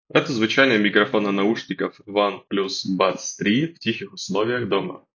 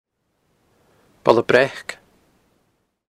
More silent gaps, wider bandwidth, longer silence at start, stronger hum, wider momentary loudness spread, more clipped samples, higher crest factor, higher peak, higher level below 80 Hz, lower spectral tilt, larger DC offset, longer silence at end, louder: neither; second, 7.2 kHz vs 14 kHz; second, 0.15 s vs 1.25 s; neither; second, 10 LU vs 18 LU; neither; about the same, 20 dB vs 24 dB; about the same, -2 dBFS vs 0 dBFS; about the same, -64 dBFS vs -62 dBFS; about the same, -4.5 dB/octave vs -5 dB/octave; neither; second, 0.2 s vs 1.15 s; second, -21 LUFS vs -18 LUFS